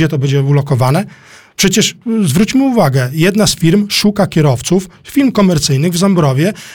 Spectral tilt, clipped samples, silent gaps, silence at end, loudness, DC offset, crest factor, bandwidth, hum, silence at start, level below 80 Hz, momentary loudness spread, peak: -5 dB/octave; under 0.1%; none; 0 s; -12 LUFS; 0.3%; 10 dB; 19 kHz; none; 0 s; -40 dBFS; 5 LU; 0 dBFS